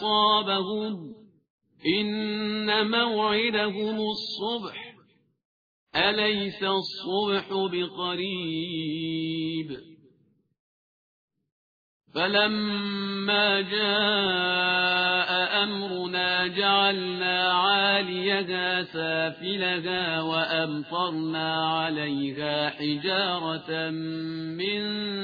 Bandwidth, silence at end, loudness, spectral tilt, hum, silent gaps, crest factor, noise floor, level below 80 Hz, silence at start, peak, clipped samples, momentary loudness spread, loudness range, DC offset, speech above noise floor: 5 kHz; 0 s; -25 LUFS; -6 dB/octave; none; 1.50-1.58 s, 5.45-5.87 s, 10.59-11.28 s, 11.52-12.00 s; 20 dB; -66 dBFS; -68 dBFS; 0 s; -8 dBFS; under 0.1%; 9 LU; 7 LU; under 0.1%; 39 dB